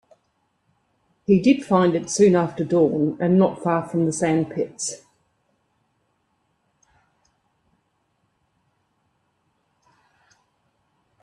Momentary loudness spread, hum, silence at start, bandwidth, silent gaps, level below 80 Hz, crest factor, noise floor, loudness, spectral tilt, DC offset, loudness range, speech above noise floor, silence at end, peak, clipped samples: 10 LU; none; 1.3 s; 11.5 kHz; none; -62 dBFS; 20 dB; -70 dBFS; -20 LUFS; -6 dB/octave; under 0.1%; 12 LU; 50 dB; 6.25 s; -4 dBFS; under 0.1%